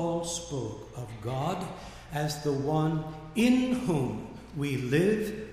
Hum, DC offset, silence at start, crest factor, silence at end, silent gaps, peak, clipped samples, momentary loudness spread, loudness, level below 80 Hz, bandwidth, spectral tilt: none; under 0.1%; 0 s; 16 dB; 0 s; none; -14 dBFS; under 0.1%; 14 LU; -30 LUFS; -52 dBFS; 15.5 kHz; -6 dB/octave